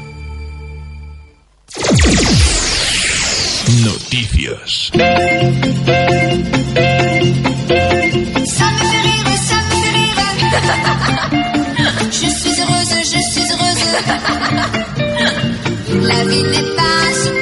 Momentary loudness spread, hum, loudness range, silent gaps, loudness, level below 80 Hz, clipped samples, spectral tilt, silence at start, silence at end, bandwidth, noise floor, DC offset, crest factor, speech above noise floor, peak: 6 LU; none; 2 LU; none; -13 LUFS; -28 dBFS; under 0.1%; -4 dB/octave; 0 s; 0 s; 11.5 kHz; -43 dBFS; under 0.1%; 14 dB; 31 dB; 0 dBFS